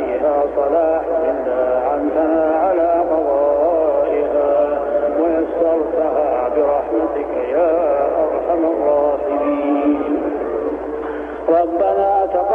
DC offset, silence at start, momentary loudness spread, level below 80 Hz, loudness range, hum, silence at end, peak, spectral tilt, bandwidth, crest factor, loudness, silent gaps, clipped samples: under 0.1%; 0 s; 5 LU; -44 dBFS; 2 LU; none; 0 s; -4 dBFS; -8.5 dB/octave; 3.7 kHz; 12 dB; -17 LUFS; none; under 0.1%